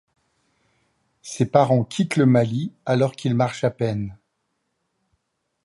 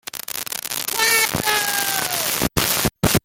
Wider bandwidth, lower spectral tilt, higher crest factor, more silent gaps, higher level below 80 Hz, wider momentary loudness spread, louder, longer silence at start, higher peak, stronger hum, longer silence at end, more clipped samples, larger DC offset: second, 11.5 kHz vs 17 kHz; first, -7 dB/octave vs -2 dB/octave; about the same, 20 dB vs 20 dB; neither; second, -58 dBFS vs -42 dBFS; first, 12 LU vs 9 LU; about the same, -21 LUFS vs -19 LUFS; first, 1.25 s vs 0.15 s; about the same, -4 dBFS vs -2 dBFS; neither; first, 1.5 s vs 0.05 s; neither; neither